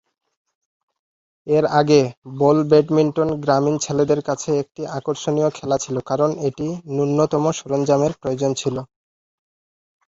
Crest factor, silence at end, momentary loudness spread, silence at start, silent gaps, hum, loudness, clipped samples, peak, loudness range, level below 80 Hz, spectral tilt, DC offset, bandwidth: 18 dB; 1.2 s; 10 LU; 1.45 s; 2.17-2.22 s; none; -19 LUFS; under 0.1%; -2 dBFS; 4 LU; -56 dBFS; -6 dB/octave; under 0.1%; 8 kHz